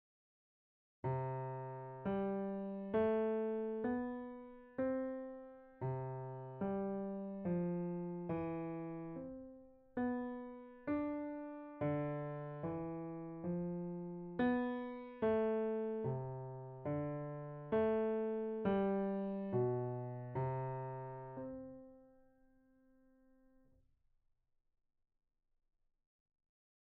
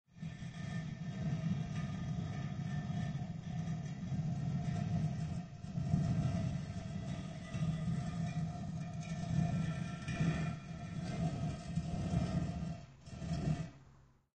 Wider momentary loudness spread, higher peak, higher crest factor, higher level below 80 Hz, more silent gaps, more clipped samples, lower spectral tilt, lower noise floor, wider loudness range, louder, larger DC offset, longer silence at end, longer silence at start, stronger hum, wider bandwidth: first, 12 LU vs 8 LU; second, -24 dBFS vs -20 dBFS; about the same, 18 dB vs 18 dB; second, -70 dBFS vs -54 dBFS; neither; neither; about the same, -8.5 dB/octave vs -7.5 dB/octave; first, -78 dBFS vs -64 dBFS; first, 6 LU vs 2 LU; about the same, -41 LUFS vs -40 LUFS; neither; first, 4.75 s vs 0.4 s; first, 1.05 s vs 0.15 s; neither; second, 4.3 kHz vs 9 kHz